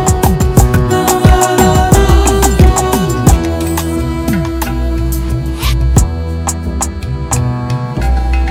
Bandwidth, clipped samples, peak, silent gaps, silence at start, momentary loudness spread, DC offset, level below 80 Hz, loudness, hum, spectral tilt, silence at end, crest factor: 17.5 kHz; 1%; 0 dBFS; none; 0 s; 8 LU; under 0.1%; -14 dBFS; -12 LUFS; none; -5.5 dB/octave; 0 s; 10 dB